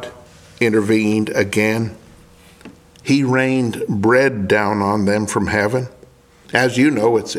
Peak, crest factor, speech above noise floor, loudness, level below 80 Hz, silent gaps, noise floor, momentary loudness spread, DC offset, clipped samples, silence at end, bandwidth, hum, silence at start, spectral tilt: 0 dBFS; 18 dB; 31 dB; -17 LUFS; -52 dBFS; none; -47 dBFS; 7 LU; under 0.1%; under 0.1%; 0 s; 15.5 kHz; none; 0 s; -5.5 dB/octave